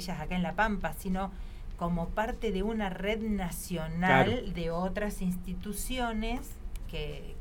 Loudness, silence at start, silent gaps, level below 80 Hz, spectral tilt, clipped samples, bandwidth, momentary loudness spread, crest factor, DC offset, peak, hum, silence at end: -32 LUFS; 0 s; none; -40 dBFS; -5.5 dB/octave; under 0.1%; 18.5 kHz; 12 LU; 22 dB; under 0.1%; -10 dBFS; none; 0 s